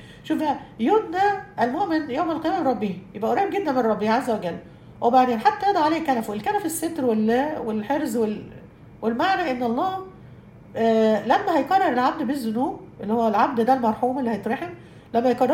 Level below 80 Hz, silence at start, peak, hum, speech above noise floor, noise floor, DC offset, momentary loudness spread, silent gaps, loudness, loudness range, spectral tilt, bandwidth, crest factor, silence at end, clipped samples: -58 dBFS; 0 s; -4 dBFS; none; 23 dB; -45 dBFS; under 0.1%; 9 LU; none; -23 LUFS; 3 LU; -5.5 dB/octave; 16 kHz; 18 dB; 0 s; under 0.1%